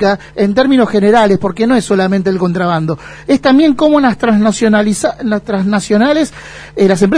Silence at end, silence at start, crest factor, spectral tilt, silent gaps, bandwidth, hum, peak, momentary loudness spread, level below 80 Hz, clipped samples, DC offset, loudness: 0 s; 0 s; 10 dB; -6 dB/octave; none; 11 kHz; none; 0 dBFS; 7 LU; -42 dBFS; under 0.1%; under 0.1%; -11 LUFS